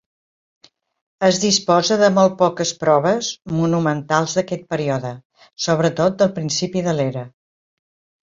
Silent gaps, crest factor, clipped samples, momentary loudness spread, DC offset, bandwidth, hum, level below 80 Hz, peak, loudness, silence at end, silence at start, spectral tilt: 5.25-5.30 s; 20 dB; under 0.1%; 9 LU; under 0.1%; 7.8 kHz; none; -58 dBFS; 0 dBFS; -18 LUFS; 1 s; 1.2 s; -4.5 dB/octave